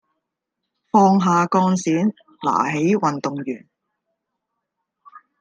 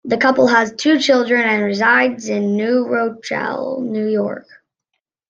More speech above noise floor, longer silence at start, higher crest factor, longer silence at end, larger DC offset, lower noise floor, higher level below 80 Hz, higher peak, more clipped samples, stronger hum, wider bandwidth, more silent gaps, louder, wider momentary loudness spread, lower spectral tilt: about the same, 62 dB vs 60 dB; first, 0.95 s vs 0.05 s; about the same, 20 dB vs 16 dB; second, 0.2 s vs 0.9 s; neither; first, -80 dBFS vs -76 dBFS; about the same, -68 dBFS vs -64 dBFS; about the same, -2 dBFS vs -2 dBFS; neither; neither; first, 9.2 kHz vs 8 kHz; neither; second, -19 LUFS vs -16 LUFS; first, 12 LU vs 9 LU; first, -6.5 dB/octave vs -4.5 dB/octave